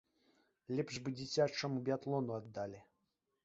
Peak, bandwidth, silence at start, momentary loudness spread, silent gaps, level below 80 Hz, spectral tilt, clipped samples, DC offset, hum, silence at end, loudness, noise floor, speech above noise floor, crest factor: -20 dBFS; 8 kHz; 0.7 s; 10 LU; none; -74 dBFS; -5 dB/octave; under 0.1%; under 0.1%; none; 0.6 s; -40 LUFS; -85 dBFS; 46 dB; 20 dB